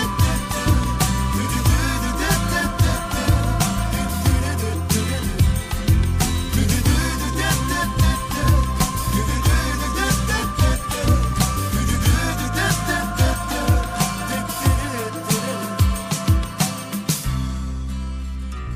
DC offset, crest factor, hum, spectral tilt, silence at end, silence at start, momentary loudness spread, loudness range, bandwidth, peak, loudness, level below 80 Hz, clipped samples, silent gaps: under 0.1%; 16 dB; none; -4.5 dB/octave; 0 s; 0 s; 5 LU; 2 LU; 15.5 kHz; -4 dBFS; -21 LUFS; -24 dBFS; under 0.1%; none